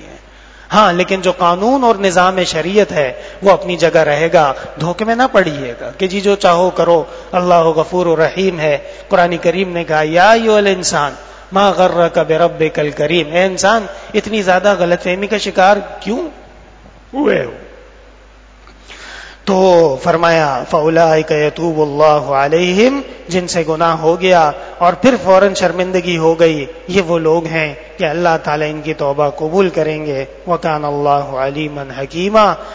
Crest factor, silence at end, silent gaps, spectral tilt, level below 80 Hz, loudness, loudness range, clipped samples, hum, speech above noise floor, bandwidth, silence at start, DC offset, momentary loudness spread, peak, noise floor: 14 dB; 0 s; none; -5 dB/octave; -42 dBFS; -13 LUFS; 4 LU; 0.2%; none; 28 dB; 8 kHz; 0 s; under 0.1%; 9 LU; 0 dBFS; -41 dBFS